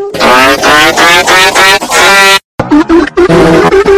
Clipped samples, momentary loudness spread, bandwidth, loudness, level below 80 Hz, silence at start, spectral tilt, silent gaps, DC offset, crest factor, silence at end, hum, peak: 20%; 4 LU; 16 kHz; -4 LUFS; -30 dBFS; 0 s; -3 dB/octave; 2.44-2.58 s; under 0.1%; 4 dB; 0 s; none; 0 dBFS